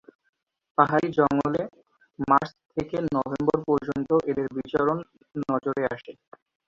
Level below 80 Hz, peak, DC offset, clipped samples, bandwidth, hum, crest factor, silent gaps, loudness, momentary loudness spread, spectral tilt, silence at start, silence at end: -58 dBFS; -2 dBFS; under 0.1%; under 0.1%; 7.4 kHz; none; 24 dB; none; -25 LUFS; 11 LU; -8 dB/octave; 0.8 s; 0.55 s